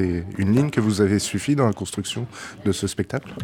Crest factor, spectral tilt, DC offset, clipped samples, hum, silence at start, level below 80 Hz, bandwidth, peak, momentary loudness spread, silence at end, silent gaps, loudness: 16 dB; -5.5 dB/octave; under 0.1%; under 0.1%; none; 0 s; -48 dBFS; 17 kHz; -6 dBFS; 9 LU; 0 s; none; -23 LUFS